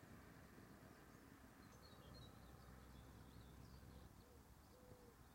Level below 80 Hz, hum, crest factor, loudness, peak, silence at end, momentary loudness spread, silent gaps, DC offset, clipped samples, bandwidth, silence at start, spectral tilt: -70 dBFS; none; 14 dB; -64 LUFS; -50 dBFS; 0 s; 4 LU; none; under 0.1%; under 0.1%; 16 kHz; 0 s; -5 dB/octave